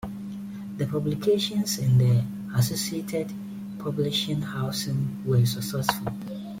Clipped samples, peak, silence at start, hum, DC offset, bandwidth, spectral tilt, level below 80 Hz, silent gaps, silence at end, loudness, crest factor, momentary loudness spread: under 0.1%; -6 dBFS; 0 s; none; under 0.1%; 16.5 kHz; -5.5 dB/octave; -56 dBFS; none; 0 s; -26 LUFS; 20 dB; 14 LU